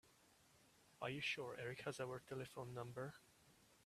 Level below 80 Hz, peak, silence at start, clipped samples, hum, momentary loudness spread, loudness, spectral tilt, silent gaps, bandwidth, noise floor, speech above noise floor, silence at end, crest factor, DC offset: -82 dBFS; -30 dBFS; 0.05 s; under 0.1%; none; 8 LU; -49 LUFS; -4.5 dB/octave; none; 15 kHz; -73 dBFS; 24 dB; 0.1 s; 20 dB; under 0.1%